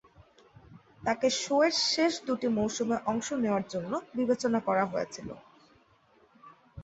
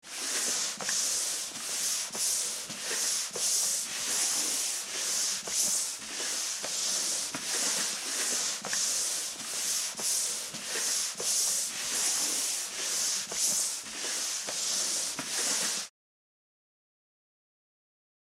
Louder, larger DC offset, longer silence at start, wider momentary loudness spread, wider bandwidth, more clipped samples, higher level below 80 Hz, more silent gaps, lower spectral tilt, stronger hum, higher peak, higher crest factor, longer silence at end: about the same, -29 LUFS vs -29 LUFS; neither; first, 0.2 s vs 0.05 s; first, 10 LU vs 5 LU; second, 8.2 kHz vs 16.5 kHz; neither; first, -64 dBFS vs -76 dBFS; neither; first, -3.5 dB/octave vs 1.5 dB/octave; neither; first, -12 dBFS vs -16 dBFS; about the same, 18 dB vs 18 dB; second, 0 s vs 2.45 s